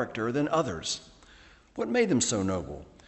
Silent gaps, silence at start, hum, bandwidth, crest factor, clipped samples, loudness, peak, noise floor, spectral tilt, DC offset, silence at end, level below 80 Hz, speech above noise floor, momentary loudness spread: none; 0 s; none; 8.6 kHz; 18 dB; under 0.1%; -29 LUFS; -12 dBFS; -55 dBFS; -4 dB/octave; under 0.1%; 0.2 s; -56 dBFS; 27 dB; 11 LU